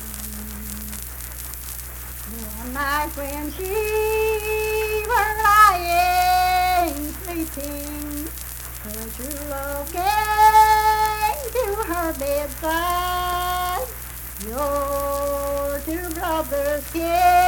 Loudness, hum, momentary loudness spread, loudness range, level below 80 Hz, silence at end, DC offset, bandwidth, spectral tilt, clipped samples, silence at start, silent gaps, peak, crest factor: -22 LUFS; none; 15 LU; 9 LU; -36 dBFS; 0 s; under 0.1%; 19.5 kHz; -3.5 dB/octave; under 0.1%; 0 s; none; -2 dBFS; 20 dB